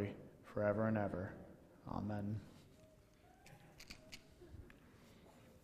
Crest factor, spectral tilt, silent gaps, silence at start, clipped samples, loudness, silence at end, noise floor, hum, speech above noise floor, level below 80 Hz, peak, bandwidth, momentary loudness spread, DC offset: 22 dB; -7.5 dB/octave; none; 0 s; under 0.1%; -43 LUFS; 0.05 s; -67 dBFS; none; 26 dB; -68 dBFS; -24 dBFS; 15 kHz; 25 LU; under 0.1%